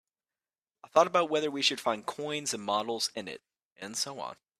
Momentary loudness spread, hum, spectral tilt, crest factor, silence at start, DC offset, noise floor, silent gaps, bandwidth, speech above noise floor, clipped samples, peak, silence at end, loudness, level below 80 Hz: 15 LU; none; -2 dB/octave; 22 dB; 0.85 s; under 0.1%; under -90 dBFS; 3.65-3.76 s; 15.5 kHz; over 59 dB; under 0.1%; -10 dBFS; 0.25 s; -30 LUFS; -78 dBFS